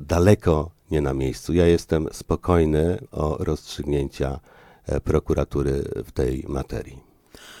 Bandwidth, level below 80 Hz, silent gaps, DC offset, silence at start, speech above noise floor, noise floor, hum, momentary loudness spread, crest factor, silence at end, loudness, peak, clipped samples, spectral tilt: 16 kHz; -34 dBFS; none; under 0.1%; 0 s; 25 dB; -47 dBFS; none; 10 LU; 20 dB; 0 s; -23 LUFS; -2 dBFS; under 0.1%; -7 dB/octave